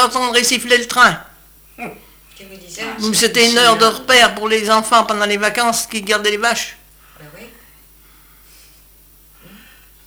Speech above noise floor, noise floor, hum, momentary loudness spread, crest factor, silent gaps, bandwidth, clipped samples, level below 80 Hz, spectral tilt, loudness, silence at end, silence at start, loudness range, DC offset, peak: 32 dB; -47 dBFS; none; 18 LU; 18 dB; none; over 20 kHz; under 0.1%; -50 dBFS; -1.5 dB/octave; -13 LUFS; 2.6 s; 0 s; 10 LU; under 0.1%; 0 dBFS